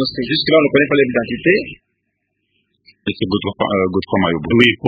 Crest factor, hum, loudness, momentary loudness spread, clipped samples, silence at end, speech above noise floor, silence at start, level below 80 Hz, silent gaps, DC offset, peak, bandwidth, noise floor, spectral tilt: 16 dB; none; -16 LUFS; 9 LU; under 0.1%; 0 s; 56 dB; 0 s; -44 dBFS; none; under 0.1%; 0 dBFS; 8 kHz; -71 dBFS; -7.5 dB/octave